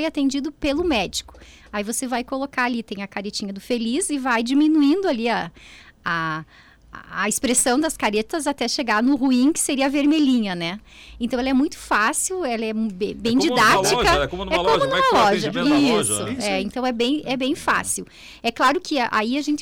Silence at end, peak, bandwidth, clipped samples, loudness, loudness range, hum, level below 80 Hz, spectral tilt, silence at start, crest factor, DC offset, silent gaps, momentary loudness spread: 0 s; -8 dBFS; 18.5 kHz; under 0.1%; -21 LUFS; 5 LU; none; -46 dBFS; -3 dB/octave; 0 s; 12 dB; under 0.1%; none; 10 LU